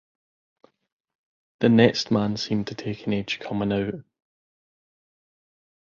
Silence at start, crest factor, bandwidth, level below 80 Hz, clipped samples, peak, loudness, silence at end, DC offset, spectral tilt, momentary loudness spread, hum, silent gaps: 1.6 s; 24 dB; 7.4 kHz; -58 dBFS; under 0.1%; -2 dBFS; -24 LUFS; 1.85 s; under 0.1%; -6 dB/octave; 13 LU; none; none